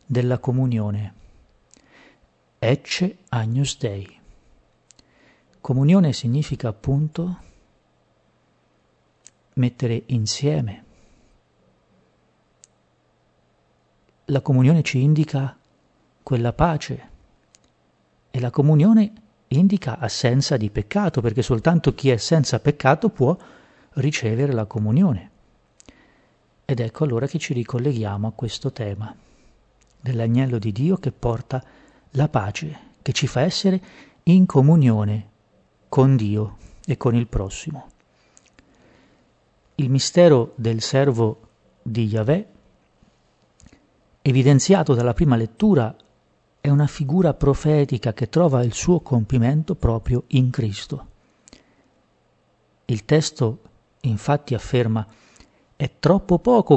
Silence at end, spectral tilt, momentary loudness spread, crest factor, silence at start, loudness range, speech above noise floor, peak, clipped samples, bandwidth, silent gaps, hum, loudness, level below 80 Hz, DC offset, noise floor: 0 s; -6.5 dB/octave; 13 LU; 20 dB; 0.1 s; 7 LU; 44 dB; 0 dBFS; under 0.1%; 8.4 kHz; none; none; -21 LUFS; -44 dBFS; under 0.1%; -63 dBFS